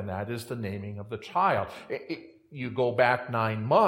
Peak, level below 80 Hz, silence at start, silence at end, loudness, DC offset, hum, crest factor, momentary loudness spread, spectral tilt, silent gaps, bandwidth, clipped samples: -8 dBFS; -68 dBFS; 0 s; 0 s; -29 LUFS; under 0.1%; none; 20 dB; 14 LU; -6.5 dB/octave; none; 16.5 kHz; under 0.1%